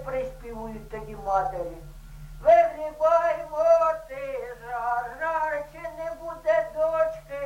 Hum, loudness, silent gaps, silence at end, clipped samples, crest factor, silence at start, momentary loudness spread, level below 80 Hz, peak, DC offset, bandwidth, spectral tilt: none; -25 LUFS; none; 0 s; under 0.1%; 18 dB; 0 s; 17 LU; -48 dBFS; -8 dBFS; under 0.1%; 15.5 kHz; -5.5 dB/octave